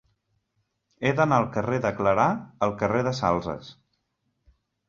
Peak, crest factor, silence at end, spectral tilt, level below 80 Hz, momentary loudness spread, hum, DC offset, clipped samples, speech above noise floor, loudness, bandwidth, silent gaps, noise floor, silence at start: -6 dBFS; 20 dB; 1.15 s; -6.5 dB/octave; -54 dBFS; 7 LU; none; under 0.1%; under 0.1%; 52 dB; -25 LUFS; 7.6 kHz; none; -76 dBFS; 1 s